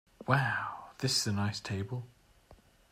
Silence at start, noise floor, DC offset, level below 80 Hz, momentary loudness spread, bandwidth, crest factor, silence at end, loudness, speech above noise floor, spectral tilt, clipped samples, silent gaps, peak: 0.2 s; -61 dBFS; under 0.1%; -66 dBFS; 12 LU; 16 kHz; 22 dB; 0.35 s; -33 LUFS; 29 dB; -4 dB/octave; under 0.1%; none; -12 dBFS